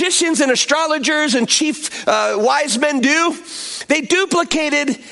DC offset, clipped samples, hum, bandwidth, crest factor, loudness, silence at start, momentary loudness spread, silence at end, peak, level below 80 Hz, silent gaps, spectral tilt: under 0.1%; under 0.1%; none; 11.5 kHz; 14 dB; -16 LUFS; 0 s; 6 LU; 0 s; -2 dBFS; -58 dBFS; none; -1.5 dB/octave